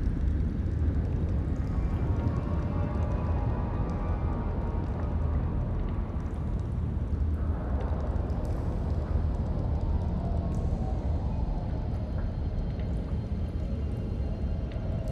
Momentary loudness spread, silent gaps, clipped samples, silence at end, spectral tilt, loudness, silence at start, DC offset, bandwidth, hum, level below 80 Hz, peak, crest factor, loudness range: 3 LU; none; under 0.1%; 0 s; -9.5 dB/octave; -31 LUFS; 0 s; under 0.1%; 6.2 kHz; none; -32 dBFS; -16 dBFS; 14 dB; 3 LU